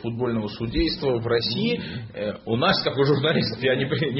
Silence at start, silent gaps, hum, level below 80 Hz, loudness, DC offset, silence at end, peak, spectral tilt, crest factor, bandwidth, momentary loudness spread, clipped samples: 0 s; none; none; -42 dBFS; -23 LUFS; under 0.1%; 0 s; -8 dBFS; -9.5 dB/octave; 16 dB; 6 kHz; 9 LU; under 0.1%